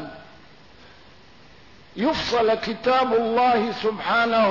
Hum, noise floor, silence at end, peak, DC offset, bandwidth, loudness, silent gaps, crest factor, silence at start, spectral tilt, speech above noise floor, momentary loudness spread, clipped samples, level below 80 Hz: none; -50 dBFS; 0 s; -12 dBFS; 0.3%; 6 kHz; -21 LUFS; none; 12 dB; 0 s; -5 dB/octave; 29 dB; 6 LU; under 0.1%; -54 dBFS